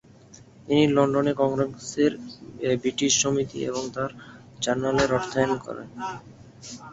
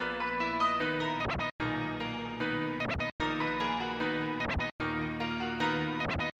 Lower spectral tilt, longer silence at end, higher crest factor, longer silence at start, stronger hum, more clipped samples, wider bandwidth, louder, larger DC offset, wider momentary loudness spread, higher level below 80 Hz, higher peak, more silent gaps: second, -4 dB/octave vs -5.5 dB/octave; about the same, 0 s vs 0.1 s; about the same, 20 dB vs 16 dB; first, 0.3 s vs 0 s; neither; neither; about the same, 8 kHz vs 8.8 kHz; first, -25 LUFS vs -32 LUFS; neither; first, 18 LU vs 4 LU; second, -56 dBFS vs -50 dBFS; first, -6 dBFS vs -18 dBFS; second, none vs 1.51-1.59 s, 3.12-3.19 s, 4.72-4.79 s